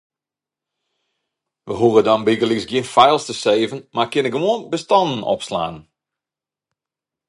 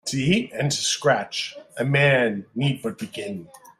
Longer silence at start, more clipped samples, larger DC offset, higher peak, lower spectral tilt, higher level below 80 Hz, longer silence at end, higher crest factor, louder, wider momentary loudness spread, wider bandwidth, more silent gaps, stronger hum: first, 1.65 s vs 0.05 s; neither; neither; first, 0 dBFS vs -6 dBFS; about the same, -5 dB/octave vs -4.5 dB/octave; about the same, -58 dBFS vs -58 dBFS; first, 1.5 s vs 0.2 s; about the same, 20 dB vs 18 dB; first, -18 LUFS vs -23 LUFS; second, 9 LU vs 14 LU; second, 11.5 kHz vs 14 kHz; neither; neither